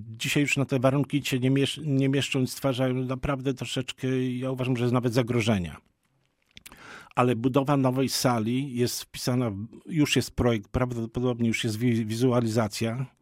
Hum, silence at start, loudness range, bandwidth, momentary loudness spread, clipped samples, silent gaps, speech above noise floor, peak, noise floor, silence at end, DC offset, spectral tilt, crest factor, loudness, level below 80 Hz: none; 0 s; 2 LU; 16 kHz; 6 LU; under 0.1%; none; 45 dB; -8 dBFS; -71 dBFS; 0.15 s; under 0.1%; -5.5 dB/octave; 20 dB; -26 LUFS; -50 dBFS